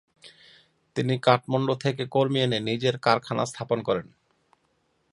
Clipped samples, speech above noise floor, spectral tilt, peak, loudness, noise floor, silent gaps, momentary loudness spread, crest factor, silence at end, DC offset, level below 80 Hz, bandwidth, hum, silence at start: under 0.1%; 45 dB; -6 dB/octave; -2 dBFS; -25 LUFS; -70 dBFS; none; 7 LU; 24 dB; 1.1 s; under 0.1%; -66 dBFS; 11.5 kHz; none; 0.25 s